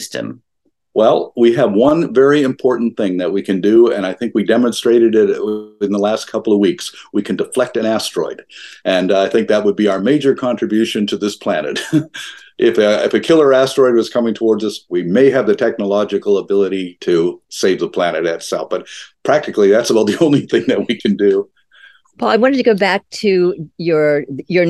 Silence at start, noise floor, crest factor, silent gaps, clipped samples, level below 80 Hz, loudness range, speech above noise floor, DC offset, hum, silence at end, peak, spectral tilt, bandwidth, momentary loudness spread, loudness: 0 s; -46 dBFS; 14 dB; none; under 0.1%; -60 dBFS; 3 LU; 32 dB; under 0.1%; none; 0 s; 0 dBFS; -5.5 dB/octave; 12.5 kHz; 10 LU; -15 LUFS